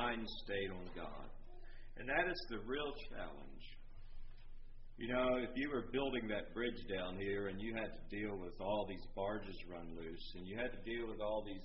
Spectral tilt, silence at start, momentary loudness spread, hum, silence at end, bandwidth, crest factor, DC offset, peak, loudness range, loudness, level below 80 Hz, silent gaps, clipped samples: -3.5 dB/octave; 0 s; 21 LU; none; 0 s; 5.8 kHz; 20 dB; under 0.1%; -22 dBFS; 4 LU; -43 LUFS; -52 dBFS; none; under 0.1%